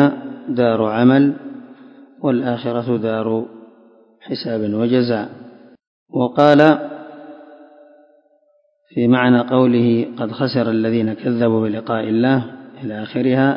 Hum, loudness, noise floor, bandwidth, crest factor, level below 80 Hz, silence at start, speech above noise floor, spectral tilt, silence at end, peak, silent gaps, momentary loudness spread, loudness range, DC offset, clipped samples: none; -17 LUFS; -60 dBFS; 5.8 kHz; 18 dB; -62 dBFS; 0 s; 44 dB; -9 dB/octave; 0 s; 0 dBFS; 5.87-6.06 s; 17 LU; 5 LU; under 0.1%; under 0.1%